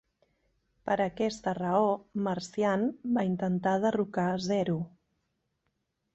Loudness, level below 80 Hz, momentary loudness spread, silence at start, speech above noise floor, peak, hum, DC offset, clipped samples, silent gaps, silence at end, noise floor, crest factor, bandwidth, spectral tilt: -30 LUFS; -66 dBFS; 5 LU; 0.85 s; 51 dB; -14 dBFS; none; under 0.1%; under 0.1%; none; 1.25 s; -80 dBFS; 18 dB; 8.2 kHz; -6.5 dB/octave